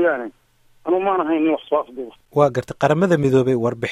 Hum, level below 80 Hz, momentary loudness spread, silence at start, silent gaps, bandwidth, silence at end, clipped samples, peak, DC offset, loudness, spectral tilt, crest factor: none; -56 dBFS; 14 LU; 0 s; none; 13 kHz; 0 s; under 0.1%; -2 dBFS; under 0.1%; -19 LUFS; -7.5 dB/octave; 18 dB